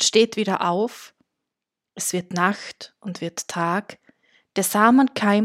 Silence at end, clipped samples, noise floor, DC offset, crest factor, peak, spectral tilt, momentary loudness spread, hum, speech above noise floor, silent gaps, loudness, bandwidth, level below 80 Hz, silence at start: 0 s; under 0.1%; -85 dBFS; under 0.1%; 20 dB; -2 dBFS; -3.5 dB/octave; 16 LU; none; 64 dB; none; -22 LUFS; 16 kHz; -74 dBFS; 0 s